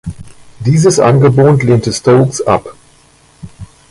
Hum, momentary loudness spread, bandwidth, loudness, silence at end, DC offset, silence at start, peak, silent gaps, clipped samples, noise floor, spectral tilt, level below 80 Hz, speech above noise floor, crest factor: none; 8 LU; 11.5 kHz; -10 LUFS; 0.25 s; under 0.1%; 0.05 s; 0 dBFS; none; under 0.1%; -46 dBFS; -6.5 dB/octave; -40 dBFS; 37 dB; 12 dB